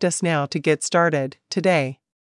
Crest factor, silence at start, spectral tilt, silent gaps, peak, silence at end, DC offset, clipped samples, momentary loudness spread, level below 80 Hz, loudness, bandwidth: 16 dB; 0 s; -4.5 dB/octave; none; -6 dBFS; 0.35 s; under 0.1%; under 0.1%; 7 LU; -74 dBFS; -21 LUFS; 12 kHz